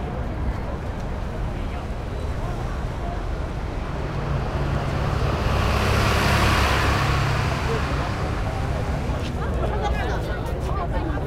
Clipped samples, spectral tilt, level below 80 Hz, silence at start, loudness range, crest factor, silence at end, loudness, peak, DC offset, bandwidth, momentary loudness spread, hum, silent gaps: under 0.1%; -5.5 dB/octave; -28 dBFS; 0 s; 8 LU; 16 dB; 0 s; -25 LUFS; -8 dBFS; under 0.1%; 16 kHz; 10 LU; none; none